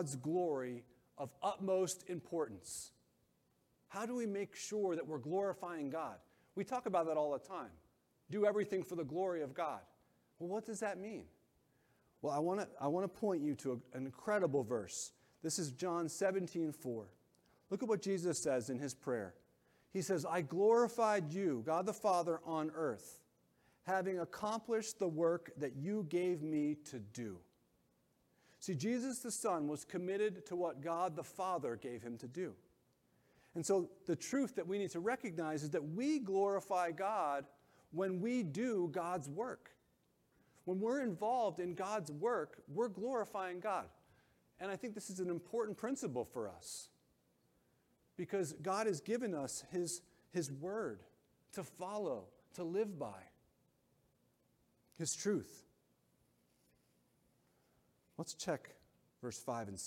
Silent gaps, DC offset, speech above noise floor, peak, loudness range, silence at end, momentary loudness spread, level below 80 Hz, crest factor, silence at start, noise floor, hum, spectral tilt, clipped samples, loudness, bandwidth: none; under 0.1%; 38 dB; -22 dBFS; 7 LU; 0 s; 12 LU; -82 dBFS; 20 dB; 0 s; -78 dBFS; none; -5 dB/octave; under 0.1%; -40 LUFS; 16.5 kHz